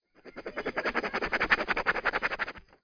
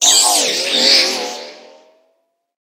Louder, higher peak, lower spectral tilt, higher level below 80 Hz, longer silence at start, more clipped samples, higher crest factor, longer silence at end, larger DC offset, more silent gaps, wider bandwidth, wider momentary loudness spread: second, -29 LUFS vs -11 LUFS; second, -10 dBFS vs 0 dBFS; first, -4 dB/octave vs 2 dB/octave; first, -52 dBFS vs -70 dBFS; first, 0.25 s vs 0 s; neither; first, 22 dB vs 16 dB; second, 0.25 s vs 1.05 s; neither; neither; second, 5.4 kHz vs 19 kHz; about the same, 13 LU vs 15 LU